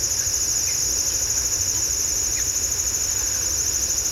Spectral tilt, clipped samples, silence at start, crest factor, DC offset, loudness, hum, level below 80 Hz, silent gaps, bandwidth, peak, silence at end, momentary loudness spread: 0 dB/octave; under 0.1%; 0 s; 14 dB; under 0.1%; -20 LUFS; none; -40 dBFS; none; 16 kHz; -8 dBFS; 0 s; 1 LU